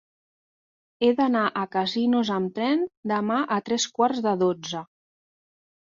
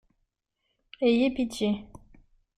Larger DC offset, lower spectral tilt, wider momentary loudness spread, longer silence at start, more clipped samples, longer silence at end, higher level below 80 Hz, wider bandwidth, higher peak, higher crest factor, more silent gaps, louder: neither; about the same, -4.5 dB/octave vs -5.5 dB/octave; about the same, 5 LU vs 6 LU; about the same, 1 s vs 1 s; neither; first, 1.1 s vs 0.75 s; second, -70 dBFS vs -58 dBFS; second, 7.6 kHz vs 13.5 kHz; first, -8 dBFS vs -14 dBFS; about the same, 16 dB vs 16 dB; first, 2.97-3.03 s vs none; first, -24 LUFS vs -27 LUFS